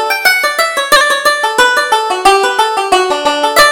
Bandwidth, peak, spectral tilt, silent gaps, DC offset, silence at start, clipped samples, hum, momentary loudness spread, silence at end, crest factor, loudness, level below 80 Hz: over 20 kHz; 0 dBFS; 0 dB/octave; none; under 0.1%; 0 s; 0.3%; none; 4 LU; 0 s; 10 dB; -10 LUFS; -42 dBFS